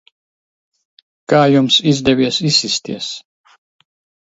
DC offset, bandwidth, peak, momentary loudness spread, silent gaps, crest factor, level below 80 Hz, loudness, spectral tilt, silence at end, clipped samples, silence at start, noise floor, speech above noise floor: under 0.1%; 8 kHz; 0 dBFS; 13 LU; none; 18 dB; -52 dBFS; -14 LUFS; -4.5 dB/octave; 1.15 s; under 0.1%; 1.3 s; under -90 dBFS; over 76 dB